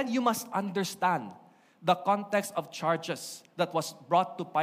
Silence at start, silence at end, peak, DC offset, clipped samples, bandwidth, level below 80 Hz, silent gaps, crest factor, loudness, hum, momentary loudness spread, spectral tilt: 0 s; 0 s; -12 dBFS; under 0.1%; under 0.1%; 15.5 kHz; -82 dBFS; none; 18 dB; -30 LUFS; none; 8 LU; -4.5 dB/octave